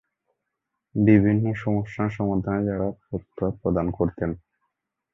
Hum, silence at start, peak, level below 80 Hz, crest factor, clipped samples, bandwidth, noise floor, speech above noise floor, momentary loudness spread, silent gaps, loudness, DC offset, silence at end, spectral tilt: none; 0.95 s; -4 dBFS; -46 dBFS; 20 dB; under 0.1%; 6 kHz; -82 dBFS; 59 dB; 13 LU; none; -24 LUFS; under 0.1%; 0.75 s; -10.5 dB/octave